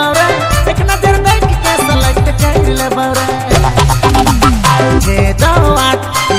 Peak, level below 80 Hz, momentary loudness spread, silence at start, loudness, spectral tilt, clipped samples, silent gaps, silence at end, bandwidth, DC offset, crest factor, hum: 0 dBFS; -16 dBFS; 4 LU; 0 s; -10 LUFS; -4.5 dB/octave; 0.6%; none; 0 s; 16.5 kHz; under 0.1%; 10 dB; none